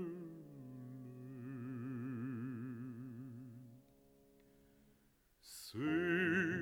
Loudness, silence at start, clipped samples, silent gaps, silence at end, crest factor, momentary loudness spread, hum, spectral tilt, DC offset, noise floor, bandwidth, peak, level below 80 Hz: -43 LUFS; 0 s; under 0.1%; none; 0 s; 18 dB; 20 LU; none; -6 dB/octave; under 0.1%; -73 dBFS; 19.5 kHz; -24 dBFS; -78 dBFS